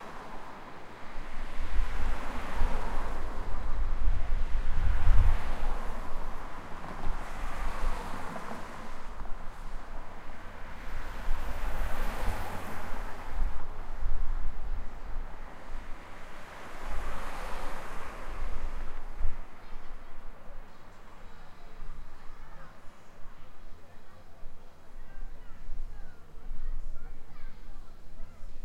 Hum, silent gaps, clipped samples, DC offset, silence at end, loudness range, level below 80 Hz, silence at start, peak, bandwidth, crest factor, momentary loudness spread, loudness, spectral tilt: none; none; under 0.1%; under 0.1%; 0.05 s; 17 LU; -32 dBFS; 0 s; -8 dBFS; 5.2 kHz; 20 dB; 17 LU; -40 LUFS; -5.5 dB/octave